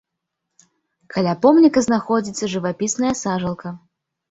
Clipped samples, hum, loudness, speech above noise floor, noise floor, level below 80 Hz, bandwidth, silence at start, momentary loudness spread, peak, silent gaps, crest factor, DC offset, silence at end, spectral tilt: under 0.1%; none; -19 LUFS; 61 dB; -79 dBFS; -56 dBFS; 8 kHz; 1.1 s; 15 LU; -2 dBFS; none; 18 dB; under 0.1%; 0.55 s; -5 dB/octave